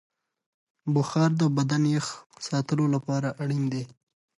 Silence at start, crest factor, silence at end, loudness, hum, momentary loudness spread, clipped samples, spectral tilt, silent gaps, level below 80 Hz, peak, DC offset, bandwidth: 0.85 s; 14 dB; 0.5 s; -26 LUFS; none; 12 LU; under 0.1%; -6.5 dB/octave; 2.26-2.30 s; -70 dBFS; -12 dBFS; under 0.1%; 11.5 kHz